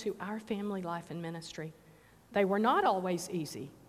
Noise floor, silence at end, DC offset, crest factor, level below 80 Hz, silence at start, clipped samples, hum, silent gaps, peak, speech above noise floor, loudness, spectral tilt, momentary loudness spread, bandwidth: -59 dBFS; 0.1 s; under 0.1%; 18 dB; -70 dBFS; 0 s; under 0.1%; none; none; -16 dBFS; 25 dB; -34 LUFS; -5.5 dB/octave; 14 LU; 15.5 kHz